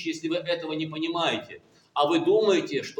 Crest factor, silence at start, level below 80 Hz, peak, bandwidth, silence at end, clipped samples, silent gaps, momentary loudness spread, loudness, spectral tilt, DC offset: 18 dB; 0 s; -76 dBFS; -10 dBFS; 10 kHz; 0.05 s; under 0.1%; none; 11 LU; -26 LUFS; -4.5 dB/octave; under 0.1%